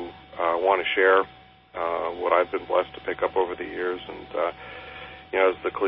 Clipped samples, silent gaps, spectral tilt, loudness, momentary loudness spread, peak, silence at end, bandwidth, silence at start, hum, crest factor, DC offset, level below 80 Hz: under 0.1%; none; -8.5 dB/octave; -25 LUFS; 18 LU; -8 dBFS; 0 s; 5.4 kHz; 0 s; none; 18 dB; under 0.1%; -58 dBFS